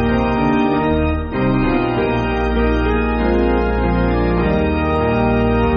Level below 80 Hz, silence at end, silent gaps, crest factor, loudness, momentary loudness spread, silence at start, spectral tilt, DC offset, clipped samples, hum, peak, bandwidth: -24 dBFS; 0 s; none; 12 dB; -17 LUFS; 2 LU; 0 s; -6.5 dB/octave; under 0.1%; under 0.1%; none; -4 dBFS; 6.6 kHz